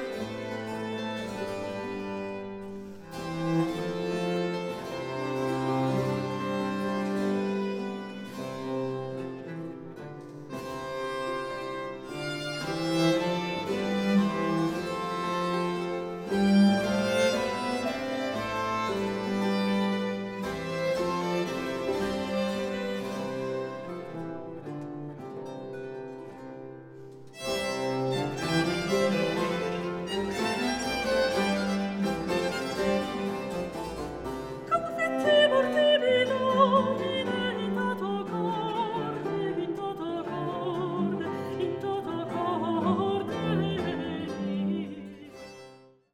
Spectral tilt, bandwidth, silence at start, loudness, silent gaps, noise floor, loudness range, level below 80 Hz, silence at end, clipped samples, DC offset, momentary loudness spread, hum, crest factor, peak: -5.5 dB/octave; 16.5 kHz; 0 s; -29 LUFS; none; -53 dBFS; 10 LU; -58 dBFS; 0.3 s; under 0.1%; under 0.1%; 13 LU; none; 20 dB; -10 dBFS